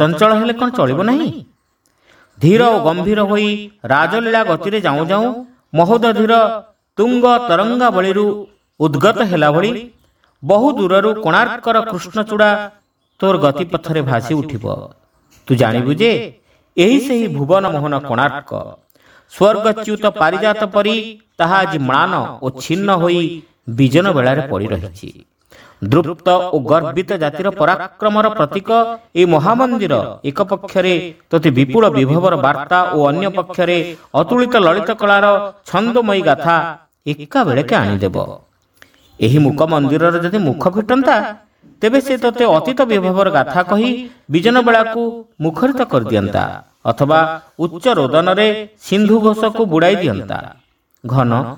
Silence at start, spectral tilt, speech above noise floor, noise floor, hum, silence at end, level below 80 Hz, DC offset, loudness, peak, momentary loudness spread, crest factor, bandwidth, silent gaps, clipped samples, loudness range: 0 s; -6.5 dB/octave; 47 dB; -61 dBFS; none; 0 s; -52 dBFS; under 0.1%; -14 LUFS; 0 dBFS; 10 LU; 14 dB; 19.5 kHz; none; under 0.1%; 3 LU